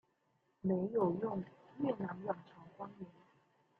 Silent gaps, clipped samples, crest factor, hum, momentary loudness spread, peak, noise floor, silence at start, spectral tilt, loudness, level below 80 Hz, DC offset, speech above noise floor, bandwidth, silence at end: none; under 0.1%; 18 dB; none; 18 LU; -22 dBFS; -78 dBFS; 0.65 s; -10.5 dB/octave; -39 LUFS; -78 dBFS; under 0.1%; 40 dB; 4.3 kHz; 0.7 s